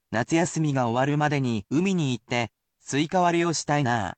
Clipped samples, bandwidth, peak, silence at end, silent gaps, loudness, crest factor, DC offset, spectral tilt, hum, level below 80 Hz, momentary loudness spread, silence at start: under 0.1%; 9.2 kHz; -10 dBFS; 0.05 s; none; -25 LUFS; 14 dB; under 0.1%; -5.5 dB/octave; none; -60 dBFS; 6 LU; 0.1 s